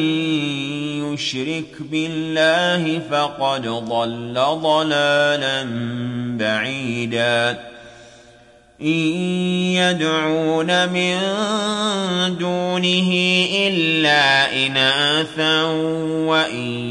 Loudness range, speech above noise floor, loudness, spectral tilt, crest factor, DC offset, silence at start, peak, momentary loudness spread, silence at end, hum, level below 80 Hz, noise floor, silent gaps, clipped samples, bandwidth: 6 LU; 30 dB; -18 LUFS; -4.5 dB/octave; 16 dB; under 0.1%; 0 s; -4 dBFS; 9 LU; 0 s; none; -60 dBFS; -49 dBFS; none; under 0.1%; 11.5 kHz